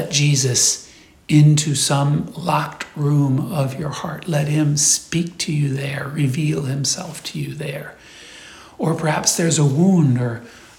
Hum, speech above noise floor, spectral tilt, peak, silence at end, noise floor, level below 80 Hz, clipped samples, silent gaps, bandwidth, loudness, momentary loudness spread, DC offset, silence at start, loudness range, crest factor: none; 23 dB; -4.5 dB/octave; -2 dBFS; 0.2 s; -41 dBFS; -54 dBFS; under 0.1%; none; 16 kHz; -18 LUFS; 13 LU; under 0.1%; 0 s; 6 LU; 18 dB